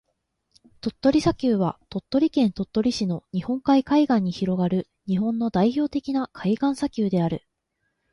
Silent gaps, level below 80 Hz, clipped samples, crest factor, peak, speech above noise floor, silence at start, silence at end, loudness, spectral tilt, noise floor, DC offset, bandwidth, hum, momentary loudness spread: none; -52 dBFS; under 0.1%; 18 dB; -6 dBFS; 53 dB; 0.85 s; 0.75 s; -24 LUFS; -7 dB/octave; -76 dBFS; under 0.1%; 11.5 kHz; none; 8 LU